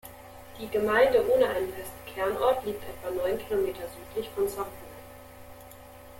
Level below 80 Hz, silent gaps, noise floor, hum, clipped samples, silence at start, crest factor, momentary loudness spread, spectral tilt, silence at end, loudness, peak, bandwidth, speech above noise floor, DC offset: -54 dBFS; none; -48 dBFS; none; under 0.1%; 0.05 s; 20 dB; 25 LU; -4.5 dB/octave; 0 s; -28 LUFS; -10 dBFS; 17 kHz; 20 dB; under 0.1%